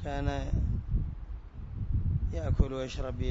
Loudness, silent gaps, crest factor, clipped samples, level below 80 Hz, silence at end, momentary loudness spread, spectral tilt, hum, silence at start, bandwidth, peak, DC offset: -33 LUFS; none; 20 dB; under 0.1%; -34 dBFS; 0 s; 14 LU; -7.5 dB/octave; none; 0 s; 7.6 kHz; -10 dBFS; under 0.1%